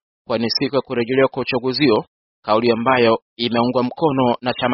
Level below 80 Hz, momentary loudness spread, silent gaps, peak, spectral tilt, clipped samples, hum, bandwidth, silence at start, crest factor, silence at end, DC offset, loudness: -56 dBFS; 5 LU; 2.08-2.43 s, 3.22-3.36 s; -2 dBFS; -3.5 dB/octave; under 0.1%; none; 5.8 kHz; 0.3 s; 16 dB; 0 s; under 0.1%; -18 LUFS